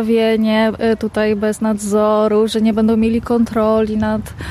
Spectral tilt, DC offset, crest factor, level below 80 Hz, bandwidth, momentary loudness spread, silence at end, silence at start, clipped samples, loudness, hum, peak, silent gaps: -6 dB/octave; under 0.1%; 10 dB; -40 dBFS; 14 kHz; 4 LU; 0 s; 0 s; under 0.1%; -15 LUFS; none; -4 dBFS; none